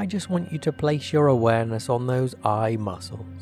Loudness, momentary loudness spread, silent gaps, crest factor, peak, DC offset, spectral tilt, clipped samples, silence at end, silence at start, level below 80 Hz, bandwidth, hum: -24 LUFS; 10 LU; none; 18 dB; -6 dBFS; under 0.1%; -7 dB/octave; under 0.1%; 0 s; 0 s; -58 dBFS; 13.5 kHz; none